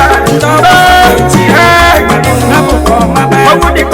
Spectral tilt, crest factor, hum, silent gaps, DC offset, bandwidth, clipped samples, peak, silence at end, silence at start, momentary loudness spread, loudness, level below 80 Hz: -4.5 dB/octave; 6 dB; none; none; under 0.1%; over 20 kHz; 5%; 0 dBFS; 0 s; 0 s; 4 LU; -5 LUFS; -18 dBFS